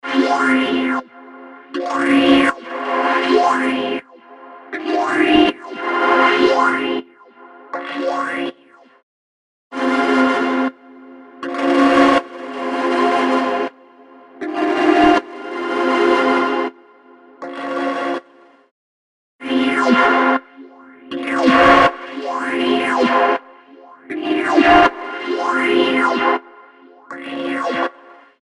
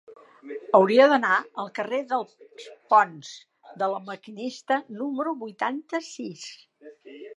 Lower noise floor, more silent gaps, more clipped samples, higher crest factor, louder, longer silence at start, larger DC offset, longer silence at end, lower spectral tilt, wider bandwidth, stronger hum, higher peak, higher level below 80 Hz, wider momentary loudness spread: about the same, -49 dBFS vs -47 dBFS; first, 9.03-9.70 s, 18.71-19.39 s vs none; neither; about the same, 18 dB vs 22 dB; first, -16 LUFS vs -24 LUFS; about the same, 0.05 s vs 0.1 s; neither; first, 0.5 s vs 0.05 s; about the same, -4.5 dB/octave vs -4.5 dB/octave; about the same, 11.5 kHz vs 10.5 kHz; neither; first, 0 dBFS vs -4 dBFS; first, -50 dBFS vs -86 dBFS; second, 15 LU vs 23 LU